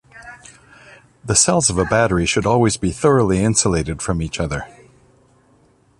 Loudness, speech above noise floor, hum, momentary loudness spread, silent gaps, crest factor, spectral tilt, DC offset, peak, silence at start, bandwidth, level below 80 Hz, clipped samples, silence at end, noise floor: -17 LUFS; 38 dB; none; 15 LU; none; 20 dB; -4 dB/octave; under 0.1%; 0 dBFS; 0.15 s; 11.5 kHz; -36 dBFS; under 0.1%; 1.3 s; -55 dBFS